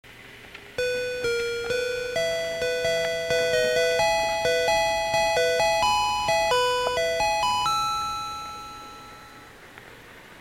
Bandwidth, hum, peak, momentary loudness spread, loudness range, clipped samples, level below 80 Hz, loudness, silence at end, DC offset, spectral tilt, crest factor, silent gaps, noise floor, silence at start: 17 kHz; none; -10 dBFS; 19 LU; 5 LU; under 0.1%; -50 dBFS; -24 LUFS; 0 s; under 0.1%; -1.5 dB/octave; 16 dB; none; -46 dBFS; 0.05 s